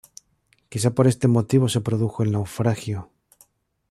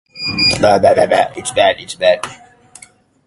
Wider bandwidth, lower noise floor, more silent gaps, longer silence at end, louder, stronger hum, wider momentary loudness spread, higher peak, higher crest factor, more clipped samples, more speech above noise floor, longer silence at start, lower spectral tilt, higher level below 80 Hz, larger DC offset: first, 13.5 kHz vs 11.5 kHz; first, -65 dBFS vs -45 dBFS; neither; about the same, 0.85 s vs 0.9 s; second, -22 LUFS vs -13 LUFS; neither; about the same, 11 LU vs 9 LU; second, -6 dBFS vs 0 dBFS; about the same, 18 dB vs 14 dB; neither; first, 44 dB vs 32 dB; first, 0.7 s vs 0.15 s; first, -6.5 dB/octave vs -3.5 dB/octave; second, -56 dBFS vs -44 dBFS; neither